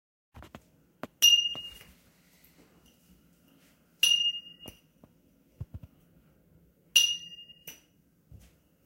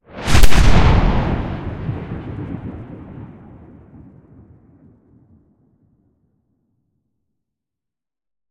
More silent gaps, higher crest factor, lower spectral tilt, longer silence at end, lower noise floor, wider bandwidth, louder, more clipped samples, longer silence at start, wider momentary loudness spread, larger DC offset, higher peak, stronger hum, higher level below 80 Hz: neither; first, 26 dB vs 16 dB; second, 1.5 dB/octave vs -5.5 dB/octave; second, 1.15 s vs 5.65 s; second, -66 dBFS vs -88 dBFS; about the same, 16 kHz vs 16 kHz; second, -24 LUFS vs -19 LUFS; neither; first, 0.35 s vs 0.15 s; first, 28 LU vs 23 LU; neither; second, -8 dBFS vs 0 dBFS; neither; second, -62 dBFS vs -22 dBFS